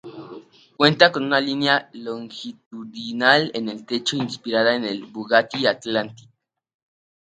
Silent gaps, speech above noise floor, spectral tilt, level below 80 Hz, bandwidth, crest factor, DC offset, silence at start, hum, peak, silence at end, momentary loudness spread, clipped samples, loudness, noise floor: 2.66-2.71 s; 21 dB; -4.5 dB/octave; -70 dBFS; 9.4 kHz; 22 dB; under 0.1%; 0.05 s; none; 0 dBFS; 1.05 s; 19 LU; under 0.1%; -20 LUFS; -43 dBFS